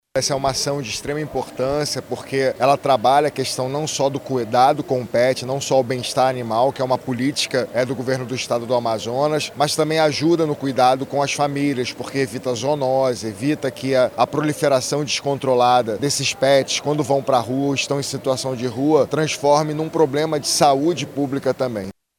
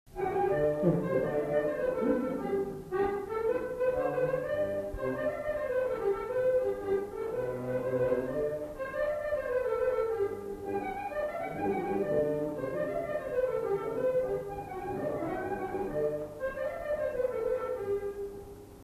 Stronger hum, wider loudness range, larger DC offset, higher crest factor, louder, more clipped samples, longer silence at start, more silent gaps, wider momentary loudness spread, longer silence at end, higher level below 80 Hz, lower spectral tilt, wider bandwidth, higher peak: neither; about the same, 2 LU vs 3 LU; neither; about the same, 18 dB vs 18 dB; first, -20 LUFS vs -32 LUFS; neither; about the same, 0.15 s vs 0.05 s; neither; about the same, 7 LU vs 6 LU; first, 0.25 s vs 0 s; about the same, -56 dBFS vs -54 dBFS; second, -4.5 dB/octave vs -7.5 dB/octave; first, 19 kHz vs 14 kHz; first, -2 dBFS vs -14 dBFS